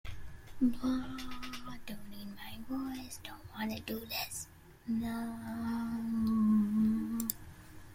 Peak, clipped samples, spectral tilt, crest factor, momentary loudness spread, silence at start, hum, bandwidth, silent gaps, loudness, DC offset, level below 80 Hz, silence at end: -12 dBFS; under 0.1%; -5 dB/octave; 22 dB; 17 LU; 0.05 s; none; 16.5 kHz; none; -36 LUFS; under 0.1%; -56 dBFS; 0 s